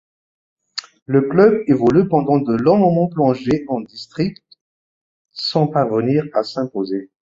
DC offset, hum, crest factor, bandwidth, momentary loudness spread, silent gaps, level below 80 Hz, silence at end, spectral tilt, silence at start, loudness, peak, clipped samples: under 0.1%; none; 16 dB; 7.6 kHz; 14 LU; 1.02-1.06 s, 4.61-5.25 s; -54 dBFS; 0.35 s; -8 dB/octave; 0.75 s; -17 LUFS; -2 dBFS; under 0.1%